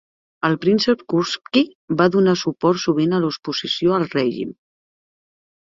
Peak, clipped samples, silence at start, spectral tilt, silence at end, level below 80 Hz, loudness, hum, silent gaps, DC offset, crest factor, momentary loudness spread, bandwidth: -2 dBFS; under 0.1%; 0.45 s; -5.5 dB/octave; 1.25 s; -60 dBFS; -19 LUFS; none; 1.75-1.88 s; under 0.1%; 18 dB; 6 LU; 7.6 kHz